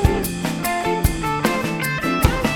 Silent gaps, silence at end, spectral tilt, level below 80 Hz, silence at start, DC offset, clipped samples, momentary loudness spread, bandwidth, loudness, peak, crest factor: none; 0 s; -5 dB/octave; -28 dBFS; 0 s; under 0.1%; under 0.1%; 4 LU; over 20 kHz; -21 LUFS; 0 dBFS; 20 dB